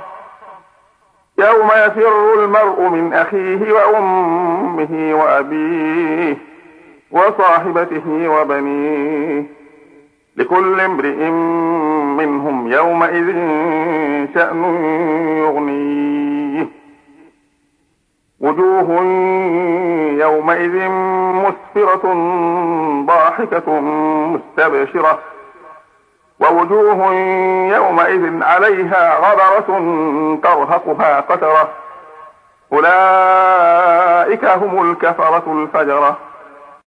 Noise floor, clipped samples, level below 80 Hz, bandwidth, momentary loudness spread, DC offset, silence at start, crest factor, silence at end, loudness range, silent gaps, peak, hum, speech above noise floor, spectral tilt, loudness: -62 dBFS; under 0.1%; -66 dBFS; 9.8 kHz; 8 LU; under 0.1%; 0 s; 14 dB; 0.25 s; 5 LU; none; 0 dBFS; none; 50 dB; -7.5 dB/octave; -13 LUFS